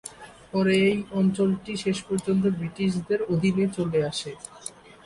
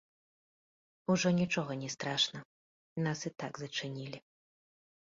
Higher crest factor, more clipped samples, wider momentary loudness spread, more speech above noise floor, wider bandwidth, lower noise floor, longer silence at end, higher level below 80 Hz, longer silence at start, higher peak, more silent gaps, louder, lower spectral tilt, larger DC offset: second, 14 dB vs 20 dB; neither; about the same, 15 LU vs 16 LU; second, 19 dB vs over 55 dB; first, 11.5 kHz vs 7.6 kHz; second, -44 dBFS vs under -90 dBFS; second, 0.35 s vs 0.95 s; first, -56 dBFS vs -74 dBFS; second, 0.05 s vs 1.1 s; first, -12 dBFS vs -18 dBFS; second, none vs 2.45-2.96 s; first, -25 LUFS vs -35 LUFS; first, -6 dB/octave vs -4 dB/octave; neither